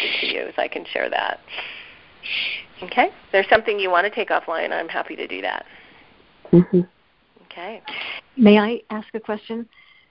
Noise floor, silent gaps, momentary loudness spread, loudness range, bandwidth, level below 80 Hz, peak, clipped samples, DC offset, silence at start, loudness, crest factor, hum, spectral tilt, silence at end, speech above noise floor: -57 dBFS; none; 16 LU; 4 LU; 5.6 kHz; -56 dBFS; 0 dBFS; under 0.1%; 0.1%; 0 s; -21 LUFS; 22 dB; none; -10.5 dB/octave; 0.45 s; 36 dB